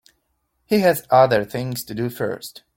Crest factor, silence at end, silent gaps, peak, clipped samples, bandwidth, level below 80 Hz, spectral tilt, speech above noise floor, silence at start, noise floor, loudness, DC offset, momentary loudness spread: 18 dB; 0.25 s; none; -2 dBFS; under 0.1%; 17 kHz; -56 dBFS; -5.5 dB/octave; 51 dB; 0.7 s; -71 dBFS; -20 LUFS; under 0.1%; 12 LU